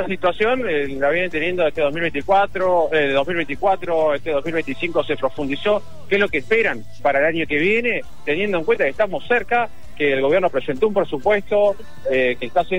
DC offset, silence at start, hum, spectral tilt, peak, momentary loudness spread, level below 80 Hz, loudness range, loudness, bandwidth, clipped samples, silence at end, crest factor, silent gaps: 4%; 0 s; none; -6 dB/octave; -4 dBFS; 5 LU; -48 dBFS; 1 LU; -20 LUFS; 16 kHz; under 0.1%; 0 s; 14 dB; none